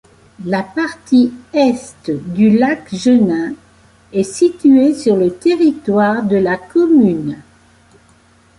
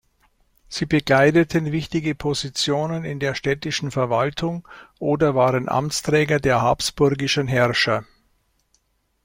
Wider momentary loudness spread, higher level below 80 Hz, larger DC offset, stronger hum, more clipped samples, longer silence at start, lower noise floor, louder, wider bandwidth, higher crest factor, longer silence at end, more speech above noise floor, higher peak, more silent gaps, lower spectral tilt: first, 12 LU vs 8 LU; about the same, -52 dBFS vs -48 dBFS; neither; neither; neither; second, 0.4 s vs 0.7 s; second, -49 dBFS vs -66 dBFS; first, -14 LUFS vs -21 LUFS; second, 11.5 kHz vs 16.5 kHz; second, 12 dB vs 18 dB; about the same, 1.2 s vs 1.2 s; second, 36 dB vs 46 dB; about the same, -2 dBFS vs -4 dBFS; neither; first, -6.5 dB/octave vs -5 dB/octave